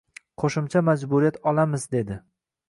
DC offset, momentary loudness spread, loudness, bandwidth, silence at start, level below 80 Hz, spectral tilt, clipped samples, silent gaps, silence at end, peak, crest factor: under 0.1%; 7 LU; -24 LUFS; 11.5 kHz; 0.4 s; -56 dBFS; -7 dB/octave; under 0.1%; none; 0.5 s; -8 dBFS; 16 dB